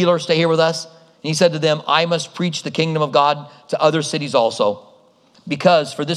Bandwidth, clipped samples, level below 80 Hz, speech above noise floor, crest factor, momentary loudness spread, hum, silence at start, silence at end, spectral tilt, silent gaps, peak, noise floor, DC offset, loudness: 12.5 kHz; under 0.1%; -72 dBFS; 35 dB; 18 dB; 11 LU; none; 0 s; 0 s; -4.5 dB/octave; none; 0 dBFS; -53 dBFS; under 0.1%; -18 LUFS